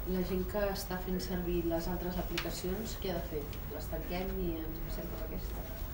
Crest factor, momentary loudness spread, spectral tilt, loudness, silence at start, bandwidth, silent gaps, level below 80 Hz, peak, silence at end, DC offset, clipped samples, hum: 18 dB; 6 LU; -5.5 dB/octave; -37 LUFS; 0 s; 16 kHz; none; -42 dBFS; -18 dBFS; 0 s; under 0.1%; under 0.1%; none